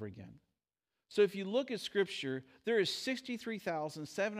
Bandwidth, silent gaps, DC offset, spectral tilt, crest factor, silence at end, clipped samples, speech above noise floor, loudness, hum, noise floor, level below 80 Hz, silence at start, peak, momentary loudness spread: 15.5 kHz; none; under 0.1%; -4.5 dB/octave; 20 dB; 0 s; under 0.1%; over 54 dB; -36 LUFS; none; under -90 dBFS; -82 dBFS; 0 s; -18 dBFS; 9 LU